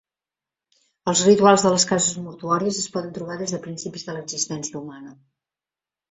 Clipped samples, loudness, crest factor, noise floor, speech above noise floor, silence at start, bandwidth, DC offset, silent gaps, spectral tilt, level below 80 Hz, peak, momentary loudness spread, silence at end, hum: under 0.1%; -21 LUFS; 22 dB; under -90 dBFS; over 68 dB; 1.05 s; 8.4 kHz; under 0.1%; none; -3.5 dB/octave; -62 dBFS; -2 dBFS; 17 LU; 1 s; none